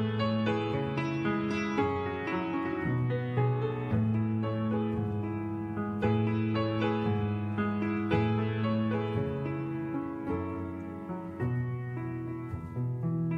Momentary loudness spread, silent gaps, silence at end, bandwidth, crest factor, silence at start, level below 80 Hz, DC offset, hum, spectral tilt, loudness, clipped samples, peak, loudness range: 8 LU; none; 0 s; 6.6 kHz; 16 dB; 0 s; -60 dBFS; under 0.1%; none; -8.5 dB/octave; -32 LUFS; under 0.1%; -14 dBFS; 5 LU